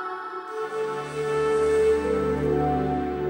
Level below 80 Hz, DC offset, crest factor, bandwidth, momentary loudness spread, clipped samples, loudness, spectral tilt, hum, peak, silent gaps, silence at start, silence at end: -44 dBFS; under 0.1%; 12 dB; 16 kHz; 11 LU; under 0.1%; -25 LUFS; -6.5 dB/octave; none; -12 dBFS; none; 0 s; 0 s